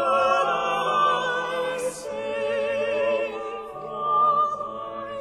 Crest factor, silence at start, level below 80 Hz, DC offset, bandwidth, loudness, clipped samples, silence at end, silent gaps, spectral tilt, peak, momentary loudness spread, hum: 16 dB; 0 s; -62 dBFS; under 0.1%; 13 kHz; -24 LUFS; under 0.1%; 0 s; none; -3 dB/octave; -8 dBFS; 12 LU; none